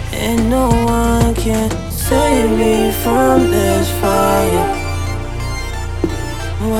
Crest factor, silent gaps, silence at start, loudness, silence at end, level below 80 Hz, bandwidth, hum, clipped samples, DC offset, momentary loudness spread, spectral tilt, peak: 14 dB; none; 0 s; -15 LUFS; 0 s; -24 dBFS; 18.5 kHz; none; under 0.1%; under 0.1%; 10 LU; -5.5 dB/octave; 0 dBFS